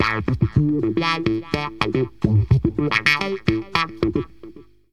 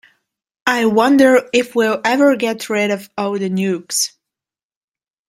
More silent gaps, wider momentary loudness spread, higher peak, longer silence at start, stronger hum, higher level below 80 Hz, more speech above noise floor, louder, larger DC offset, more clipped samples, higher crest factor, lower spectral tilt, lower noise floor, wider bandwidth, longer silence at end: neither; second, 6 LU vs 10 LU; about the same, 0 dBFS vs 0 dBFS; second, 0 s vs 0.65 s; neither; first, -38 dBFS vs -62 dBFS; second, 23 dB vs 74 dB; second, -21 LUFS vs -16 LUFS; first, 0.6% vs under 0.1%; neither; about the same, 20 dB vs 16 dB; first, -6.5 dB/octave vs -4 dB/octave; second, -43 dBFS vs -89 dBFS; second, 14 kHz vs 16 kHz; second, 0.3 s vs 1.2 s